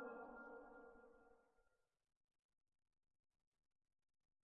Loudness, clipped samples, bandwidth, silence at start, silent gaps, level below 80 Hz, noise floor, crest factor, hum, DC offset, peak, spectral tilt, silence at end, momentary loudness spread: -60 LUFS; under 0.1%; 3.3 kHz; 0 s; none; -86 dBFS; -84 dBFS; 20 dB; none; under 0.1%; -44 dBFS; 0 dB/octave; 2.75 s; 10 LU